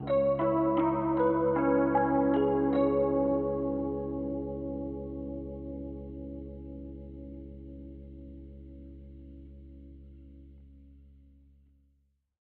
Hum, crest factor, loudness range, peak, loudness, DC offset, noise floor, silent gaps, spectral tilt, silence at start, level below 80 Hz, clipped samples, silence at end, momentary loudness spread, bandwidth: none; 16 dB; 23 LU; -14 dBFS; -29 LUFS; under 0.1%; -72 dBFS; none; -8 dB/octave; 0 s; -48 dBFS; under 0.1%; 1.45 s; 23 LU; 4.2 kHz